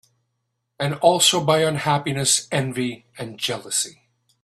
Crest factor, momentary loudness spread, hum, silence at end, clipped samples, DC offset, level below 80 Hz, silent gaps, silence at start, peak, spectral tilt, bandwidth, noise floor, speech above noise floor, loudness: 20 dB; 13 LU; none; 0.55 s; under 0.1%; under 0.1%; -62 dBFS; none; 0.8 s; -2 dBFS; -3 dB/octave; 13.5 kHz; -76 dBFS; 55 dB; -20 LUFS